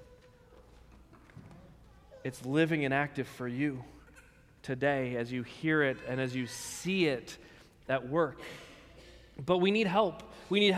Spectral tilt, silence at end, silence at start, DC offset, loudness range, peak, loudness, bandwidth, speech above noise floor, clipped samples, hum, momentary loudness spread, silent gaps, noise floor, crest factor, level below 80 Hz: -5.5 dB/octave; 0 s; 0 s; under 0.1%; 3 LU; -14 dBFS; -32 LUFS; 16 kHz; 27 dB; under 0.1%; none; 21 LU; none; -59 dBFS; 20 dB; -62 dBFS